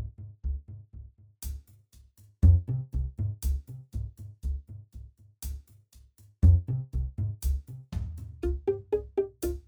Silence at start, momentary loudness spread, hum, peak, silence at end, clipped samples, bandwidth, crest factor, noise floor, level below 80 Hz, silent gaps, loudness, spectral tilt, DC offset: 0 s; 22 LU; none; -10 dBFS; 0.1 s; under 0.1%; over 20 kHz; 20 dB; -57 dBFS; -34 dBFS; none; -31 LUFS; -8.5 dB/octave; under 0.1%